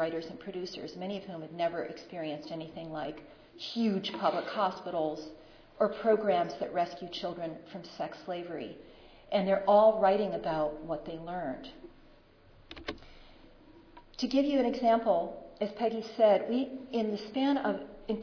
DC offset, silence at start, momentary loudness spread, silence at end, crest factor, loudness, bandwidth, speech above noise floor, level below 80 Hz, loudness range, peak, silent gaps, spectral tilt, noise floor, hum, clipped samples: under 0.1%; 0 s; 16 LU; 0 s; 18 dB; -32 LUFS; 5.4 kHz; 27 dB; -60 dBFS; 9 LU; -14 dBFS; none; -6.5 dB/octave; -59 dBFS; none; under 0.1%